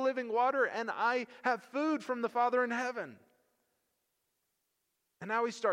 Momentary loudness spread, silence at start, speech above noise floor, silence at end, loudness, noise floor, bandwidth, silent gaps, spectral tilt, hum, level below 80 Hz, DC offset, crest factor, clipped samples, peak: 7 LU; 0 s; 49 dB; 0 s; -33 LUFS; -82 dBFS; 11 kHz; none; -4 dB/octave; none; under -90 dBFS; under 0.1%; 18 dB; under 0.1%; -16 dBFS